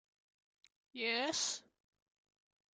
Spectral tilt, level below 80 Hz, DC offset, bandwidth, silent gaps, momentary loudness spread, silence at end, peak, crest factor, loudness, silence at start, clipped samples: 0 dB/octave; -88 dBFS; under 0.1%; 11 kHz; none; 12 LU; 1.15 s; -24 dBFS; 20 dB; -37 LUFS; 0.95 s; under 0.1%